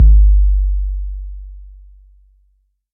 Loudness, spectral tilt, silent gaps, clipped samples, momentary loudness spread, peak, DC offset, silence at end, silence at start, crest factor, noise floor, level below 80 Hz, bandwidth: -16 LUFS; -15 dB/octave; none; under 0.1%; 23 LU; -2 dBFS; under 0.1%; 1.3 s; 0 s; 12 dB; -60 dBFS; -14 dBFS; 0.4 kHz